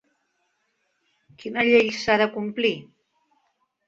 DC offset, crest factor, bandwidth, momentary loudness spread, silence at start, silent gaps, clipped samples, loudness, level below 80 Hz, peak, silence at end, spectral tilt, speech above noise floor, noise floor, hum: under 0.1%; 22 dB; 7.6 kHz; 15 LU; 1.45 s; none; under 0.1%; -22 LUFS; -62 dBFS; -4 dBFS; 1.05 s; -4.5 dB/octave; 51 dB; -72 dBFS; none